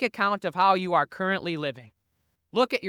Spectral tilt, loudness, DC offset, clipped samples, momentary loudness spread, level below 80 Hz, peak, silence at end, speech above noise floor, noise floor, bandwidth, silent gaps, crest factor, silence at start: -5.5 dB/octave; -25 LUFS; under 0.1%; under 0.1%; 10 LU; -74 dBFS; -8 dBFS; 0 s; 49 dB; -75 dBFS; 17.5 kHz; none; 18 dB; 0 s